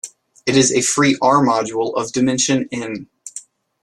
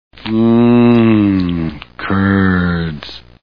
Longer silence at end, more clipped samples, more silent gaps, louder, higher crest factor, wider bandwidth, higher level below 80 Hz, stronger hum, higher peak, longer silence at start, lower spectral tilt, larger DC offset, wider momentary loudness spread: first, 0.45 s vs 0.25 s; neither; neither; second, -16 LUFS vs -13 LUFS; about the same, 16 dB vs 12 dB; first, 12.5 kHz vs 5.4 kHz; second, -56 dBFS vs -38 dBFS; neither; about the same, -2 dBFS vs 0 dBFS; second, 0.05 s vs 0.2 s; second, -3.5 dB/octave vs -9.5 dB/octave; second, under 0.1% vs 0.9%; first, 19 LU vs 14 LU